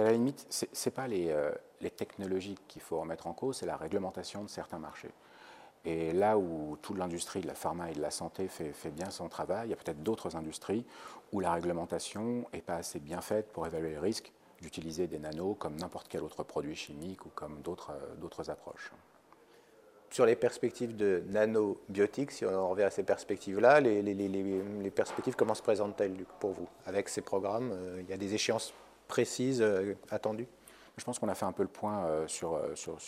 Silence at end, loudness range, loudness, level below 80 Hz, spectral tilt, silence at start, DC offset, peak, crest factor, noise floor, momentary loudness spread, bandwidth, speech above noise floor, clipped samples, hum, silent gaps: 0 s; 9 LU; -35 LUFS; -66 dBFS; -5 dB/octave; 0 s; under 0.1%; -10 dBFS; 24 dB; -61 dBFS; 13 LU; 15.5 kHz; 27 dB; under 0.1%; none; none